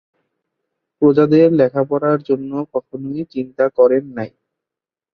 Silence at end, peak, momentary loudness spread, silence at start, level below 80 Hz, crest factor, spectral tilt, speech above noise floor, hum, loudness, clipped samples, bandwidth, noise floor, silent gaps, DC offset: 0.85 s; -2 dBFS; 15 LU; 1 s; -60 dBFS; 16 dB; -10 dB/octave; 72 dB; none; -16 LUFS; under 0.1%; 5.2 kHz; -88 dBFS; none; under 0.1%